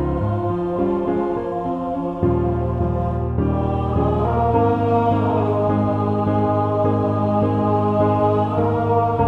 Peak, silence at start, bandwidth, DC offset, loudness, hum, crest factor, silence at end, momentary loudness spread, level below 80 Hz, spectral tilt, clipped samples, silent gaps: -6 dBFS; 0 s; 4.5 kHz; under 0.1%; -20 LUFS; none; 14 dB; 0 s; 5 LU; -34 dBFS; -10.5 dB/octave; under 0.1%; none